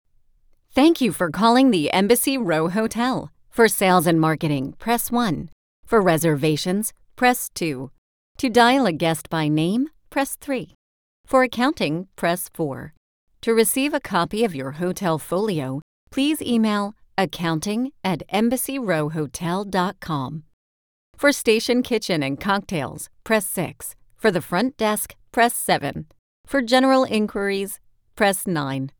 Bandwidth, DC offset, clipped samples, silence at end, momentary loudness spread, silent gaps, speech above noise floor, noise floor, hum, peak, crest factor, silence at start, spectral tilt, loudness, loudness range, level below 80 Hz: over 20 kHz; under 0.1%; under 0.1%; 0.1 s; 11 LU; 5.52-5.83 s, 7.98-8.35 s, 10.75-11.24 s, 12.97-13.27 s, 15.82-16.07 s, 20.53-21.13 s, 26.19-26.44 s; 37 dB; -57 dBFS; none; -2 dBFS; 20 dB; 0.75 s; -4.5 dB/octave; -21 LUFS; 4 LU; -52 dBFS